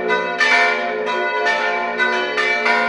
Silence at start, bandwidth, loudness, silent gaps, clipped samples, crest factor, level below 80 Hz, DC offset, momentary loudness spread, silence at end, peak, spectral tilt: 0 s; 11.5 kHz; -17 LUFS; none; under 0.1%; 16 dB; -68 dBFS; under 0.1%; 6 LU; 0 s; -2 dBFS; -2 dB/octave